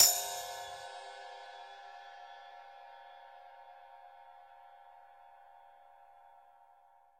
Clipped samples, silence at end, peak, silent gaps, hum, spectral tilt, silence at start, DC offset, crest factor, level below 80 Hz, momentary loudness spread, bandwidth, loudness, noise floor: under 0.1%; 0.8 s; -8 dBFS; none; none; 2.5 dB/octave; 0 s; under 0.1%; 32 dB; -80 dBFS; 18 LU; 16 kHz; -37 LUFS; -64 dBFS